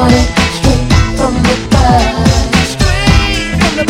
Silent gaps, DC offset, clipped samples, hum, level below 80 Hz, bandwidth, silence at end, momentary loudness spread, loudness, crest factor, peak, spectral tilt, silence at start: none; under 0.1%; 0.4%; none; -16 dBFS; 16 kHz; 0 s; 3 LU; -10 LUFS; 10 dB; 0 dBFS; -5 dB/octave; 0 s